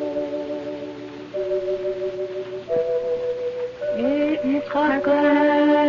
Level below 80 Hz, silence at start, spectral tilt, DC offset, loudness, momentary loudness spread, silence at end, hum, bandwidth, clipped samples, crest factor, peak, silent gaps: -58 dBFS; 0 s; -6.5 dB/octave; under 0.1%; -23 LUFS; 14 LU; 0 s; none; 7 kHz; under 0.1%; 14 dB; -8 dBFS; none